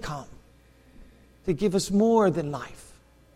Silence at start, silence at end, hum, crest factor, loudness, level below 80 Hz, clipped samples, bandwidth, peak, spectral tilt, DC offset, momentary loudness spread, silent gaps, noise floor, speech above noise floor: 0 s; 0.55 s; none; 16 dB; -25 LUFS; -50 dBFS; under 0.1%; 15 kHz; -10 dBFS; -6 dB/octave; under 0.1%; 17 LU; none; -56 dBFS; 32 dB